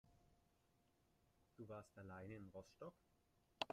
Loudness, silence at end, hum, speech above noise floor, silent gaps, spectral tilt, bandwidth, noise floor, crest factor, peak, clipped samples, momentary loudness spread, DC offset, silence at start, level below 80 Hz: -58 LUFS; 0 s; none; 23 dB; none; -5 dB/octave; 13.5 kHz; -81 dBFS; 34 dB; -26 dBFS; under 0.1%; 5 LU; under 0.1%; 0.05 s; -82 dBFS